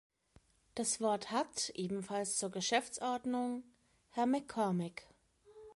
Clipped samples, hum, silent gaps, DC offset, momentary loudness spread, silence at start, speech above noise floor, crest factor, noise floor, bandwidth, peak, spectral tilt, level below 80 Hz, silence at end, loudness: under 0.1%; none; none; under 0.1%; 10 LU; 0.75 s; 32 dB; 18 dB; -69 dBFS; 11.5 kHz; -20 dBFS; -3.5 dB/octave; -76 dBFS; 0.05 s; -37 LUFS